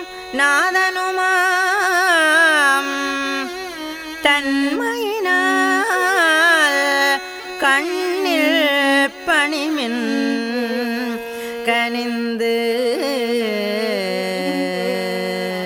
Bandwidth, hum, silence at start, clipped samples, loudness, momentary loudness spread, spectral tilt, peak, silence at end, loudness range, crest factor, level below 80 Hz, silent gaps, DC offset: over 20 kHz; none; 0 s; under 0.1%; -17 LUFS; 9 LU; -2.5 dB/octave; -2 dBFS; 0 s; 5 LU; 16 dB; -58 dBFS; none; under 0.1%